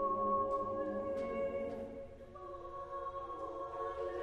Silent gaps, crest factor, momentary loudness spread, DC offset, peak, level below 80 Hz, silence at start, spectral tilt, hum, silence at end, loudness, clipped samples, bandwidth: none; 14 dB; 14 LU; under 0.1%; -26 dBFS; -60 dBFS; 0 s; -7.5 dB/octave; none; 0 s; -40 LUFS; under 0.1%; 8.4 kHz